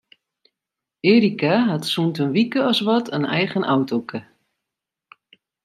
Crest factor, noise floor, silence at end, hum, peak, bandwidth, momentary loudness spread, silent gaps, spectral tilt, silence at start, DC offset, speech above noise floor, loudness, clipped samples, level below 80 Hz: 18 dB; -85 dBFS; 1.45 s; none; -4 dBFS; 13 kHz; 8 LU; none; -6 dB/octave; 1.05 s; under 0.1%; 66 dB; -20 LUFS; under 0.1%; -68 dBFS